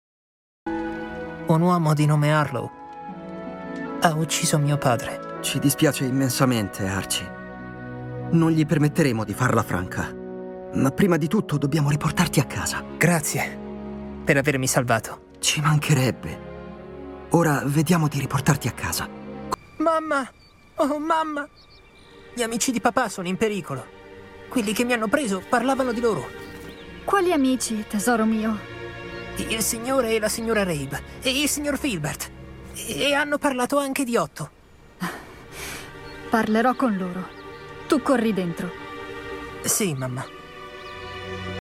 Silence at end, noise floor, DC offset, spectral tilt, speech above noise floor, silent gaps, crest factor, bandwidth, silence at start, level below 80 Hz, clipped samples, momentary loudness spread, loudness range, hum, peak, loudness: 0.05 s; -48 dBFS; under 0.1%; -5 dB/octave; 26 dB; none; 20 dB; 17 kHz; 0.65 s; -50 dBFS; under 0.1%; 17 LU; 4 LU; none; -4 dBFS; -23 LUFS